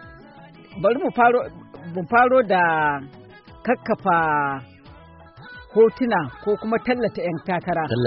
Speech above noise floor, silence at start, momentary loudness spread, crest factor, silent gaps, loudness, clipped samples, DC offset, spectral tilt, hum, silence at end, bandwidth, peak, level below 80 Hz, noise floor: 25 dB; 0 s; 16 LU; 16 dB; none; -21 LUFS; under 0.1%; under 0.1%; -4.5 dB/octave; none; 0 s; 5.8 kHz; -6 dBFS; -54 dBFS; -45 dBFS